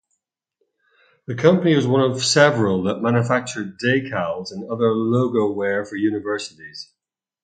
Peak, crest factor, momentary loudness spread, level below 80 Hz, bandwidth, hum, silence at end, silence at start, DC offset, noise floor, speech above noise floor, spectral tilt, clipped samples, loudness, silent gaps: 0 dBFS; 20 dB; 15 LU; -58 dBFS; 9.4 kHz; none; 0.6 s; 1.3 s; under 0.1%; -75 dBFS; 55 dB; -5.5 dB/octave; under 0.1%; -20 LUFS; none